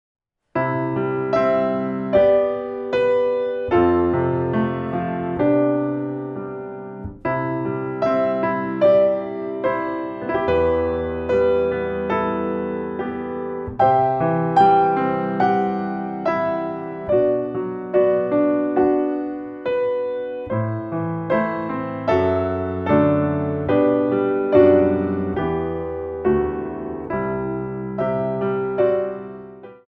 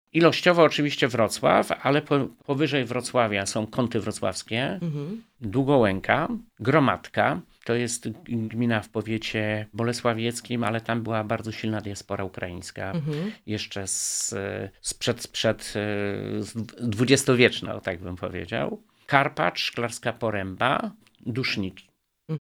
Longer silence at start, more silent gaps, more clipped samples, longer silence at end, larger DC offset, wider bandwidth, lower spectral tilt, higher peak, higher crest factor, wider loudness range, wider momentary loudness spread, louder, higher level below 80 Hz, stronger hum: first, 0.55 s vs 0.15 s; neither; neither; about the same, 0.15 s vs 0.05 s; neither; second, 6 kHz vs 18.5 kHz; first, -9.5 dB/octave vs -4.5 dB/octave; about the same, -2 dBFS vs 0 dBFS; second, 18 dB vs 24 dB; about the same, 5 LU vs 5 LU; about the same, 11 LU vs 12 LU; first, -21 LUFS vs -25 LUFS; first, -48 dBFS vs -56 dBFS; neither